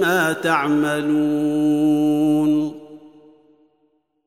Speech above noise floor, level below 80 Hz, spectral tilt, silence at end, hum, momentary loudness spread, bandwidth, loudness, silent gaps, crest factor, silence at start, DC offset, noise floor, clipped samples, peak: 47 dB; -70 dBFS; -5.5 dB/octave; 1.2 s; none; 3 LU; 15.5 kHz; -19 LUFS; none; 16 dB; 0 s; 0.1%; -65 dBFS; under 0.1%; -4 dBFS